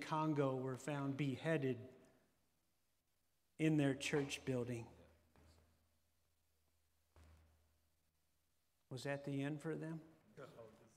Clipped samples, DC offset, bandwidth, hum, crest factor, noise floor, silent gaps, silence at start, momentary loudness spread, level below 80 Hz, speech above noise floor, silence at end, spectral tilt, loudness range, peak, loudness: under 0.1%; under 0.1%; 15 kHz; none; 22 dB; -85 dBFS; none; 0 s; 20 LU; -78 dBFS; 44 dB; 0.25 s; -6 dB/octave; 10 LU; -24 dBFS; -42 LUFS